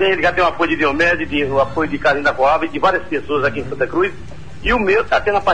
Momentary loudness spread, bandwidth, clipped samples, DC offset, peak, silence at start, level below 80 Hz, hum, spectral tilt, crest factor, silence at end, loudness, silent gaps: 6 LU; 9.8 kHz; under 0.1%; 3%; -4 dBFS; 0 s; -36 dBFS; none; -5.5 dB/octave; 14 dB; 0 s; -17 LUFS; none